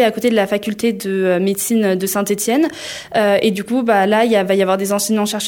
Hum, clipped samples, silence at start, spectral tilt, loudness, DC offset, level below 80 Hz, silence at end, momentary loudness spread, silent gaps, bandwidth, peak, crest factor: none; under 0.1%; 0 s; -4 dB/octave; -16 LUFS; under 0.1%; -58 dBFS; 0 s; 5 LU; none; 18.5 kHz; -2 dBFS; 14 dB